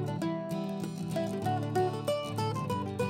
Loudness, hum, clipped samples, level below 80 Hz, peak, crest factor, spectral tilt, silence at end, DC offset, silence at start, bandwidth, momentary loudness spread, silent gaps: -33 LUFS; none; under 0.1%; -64 dBFS; -18 dBFS; 14 dB; -6.5 dB/octave; 0 s; under 0.1%; 0 s; 16 kHz; 4 LU; none